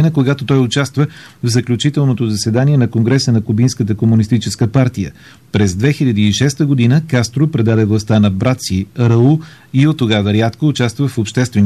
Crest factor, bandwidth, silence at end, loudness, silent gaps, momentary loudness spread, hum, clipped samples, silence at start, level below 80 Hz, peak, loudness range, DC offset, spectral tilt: 10 dB; 13 kHz; 0 s; -14 LUFS; none; 5 LU; none; under 0.1%; 0 s; -46 dBFS; -2 dBFS; 1 LU; 0.2%; -6.5 dB/octave